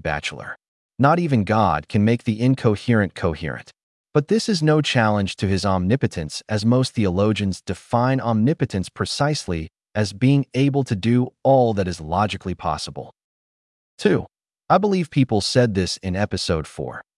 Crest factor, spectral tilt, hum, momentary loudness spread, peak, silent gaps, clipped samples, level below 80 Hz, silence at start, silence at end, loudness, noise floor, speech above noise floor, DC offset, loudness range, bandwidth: 18 dB; -6 dB/octave; none; 11 LU; -4 dBFS; 0.68-0.89 s, 3.83-4.04 s, 13.24-13.98 s; under 0.1%; -50 dBFS; 0.05 s; 0.15 s; -21 LUFS; under -90 dBFS; over 70 dB; under 0.1%; 2 LU; 12 kHz